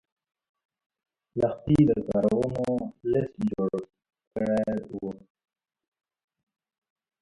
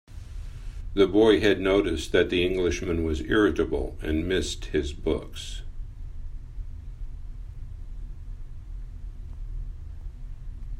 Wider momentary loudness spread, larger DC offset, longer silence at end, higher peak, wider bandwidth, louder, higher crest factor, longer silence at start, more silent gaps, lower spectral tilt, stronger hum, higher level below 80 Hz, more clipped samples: second, 14 LU vs 21 LU; neither; first, 2.05 s vs 0 s; second, -10 dBFS vs -6 dBFS; second, 11 kHz vs 13 kHz; about the same, -27 LUFS vs -25 LUFS; about the same, 20 dB vs 22 dB; first, 1.35 s vs 0.1 s; first, 4.27-4.31 s vs none; first, -9 dB/octave vs -5.5 dB/octave; neither; second, -54 dBFS vs -36 dBFS; neither